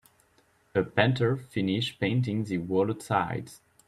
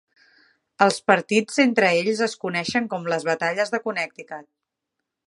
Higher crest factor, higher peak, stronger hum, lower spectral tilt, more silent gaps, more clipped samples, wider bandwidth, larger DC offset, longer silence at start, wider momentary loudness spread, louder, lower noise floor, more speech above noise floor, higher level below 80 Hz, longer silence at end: about the same, 22 dB vs 22 dB; second, -8 dBFS vs -2 dBFS; neither; first, -6.5 dB/octave vs -4 dB/octave; neither; neither; first, 13.5 kHz vs 11.5 kHz; neither; about the same, 0.75 s vs 0.8 s; second, 7 LU vs 11 LU; second, -28 LUFS vs -22 LUFS; second, -65 dBFS vs -82 dBFS; second, 38 dB vs 60 dB; first, -62 dBFS vs -70 dBFS; second, 0.3 s vs 0.85 s